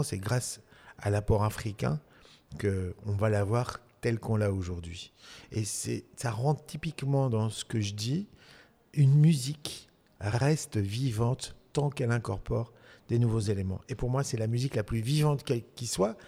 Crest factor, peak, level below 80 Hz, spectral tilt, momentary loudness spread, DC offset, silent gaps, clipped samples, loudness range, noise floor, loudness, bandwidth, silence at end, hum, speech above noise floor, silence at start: 18 dB; -12 dBFS; -50 dBFS; -6 dB/octave; 10 LU; under 0.1%; none; under 0.1%; 4 LU; -58 dBFS; -31 LUFS; 15.5 kHz; 0 s; none; 28 dB; 0 s